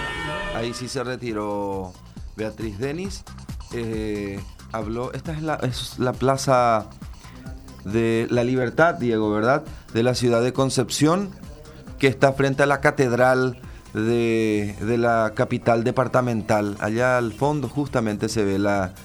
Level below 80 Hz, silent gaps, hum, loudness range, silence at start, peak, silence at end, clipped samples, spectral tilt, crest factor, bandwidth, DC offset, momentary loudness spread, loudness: -44 dBFS; none; none; 9 LU; 0 s; -2 dBFS; 0 s; under 0.1%; -5.5 dB/octave; 20 dB; over 20 kHz; under 0.1%; 17 LU; -22 LUFS